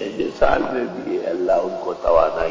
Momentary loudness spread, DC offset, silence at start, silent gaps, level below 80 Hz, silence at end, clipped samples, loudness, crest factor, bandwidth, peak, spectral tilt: 8 LU; under 0.1%; 0 s; none; -38 dBFS; 0 s; under 0.1%; -20 LUFS; 16 dB; 7.6 kHz; -4 dBFS; -6 dB/octave